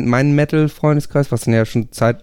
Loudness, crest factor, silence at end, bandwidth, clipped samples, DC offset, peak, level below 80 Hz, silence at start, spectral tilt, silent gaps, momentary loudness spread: -16 LUFS; 14 dB; 0 s; 16 kHz; under 0.1%; under 0.1%; -2 dBFS; -44 dBFS; 0 s; -7.5 dB/octave; none; 4 LU